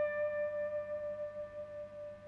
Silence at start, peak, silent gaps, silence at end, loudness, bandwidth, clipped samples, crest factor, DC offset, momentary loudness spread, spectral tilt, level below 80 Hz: 0 s; -28 dBFS; none; 0 s; -40 LUFS; 5 kHz; under 0.1%; 12 dB; under 0.1%; 10 LU; -6.5 dB/octave; -70 dBFS